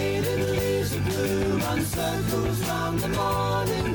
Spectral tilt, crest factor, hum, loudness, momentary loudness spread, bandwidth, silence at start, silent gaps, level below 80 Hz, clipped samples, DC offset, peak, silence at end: -5.5 dB/octave; 10 dB; none; -25 LUFS; 2 LU; 19.5 kHz; 0 s; none; -40 dBFS; under 0.1%; under 0.1%; -14 dBFS; 0 s